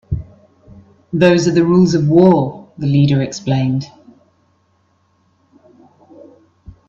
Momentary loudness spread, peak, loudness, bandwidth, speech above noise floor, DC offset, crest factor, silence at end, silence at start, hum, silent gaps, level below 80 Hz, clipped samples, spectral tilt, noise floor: 14 LU; 0 dBFS; -14 LUFS; 7.6 kHz; 47 dB; under 0.1%; 16 dB; 3 s; 0.1 s; none; none; -44 dBFS; under 0.1%; -7 dB/octave; -59 dBFS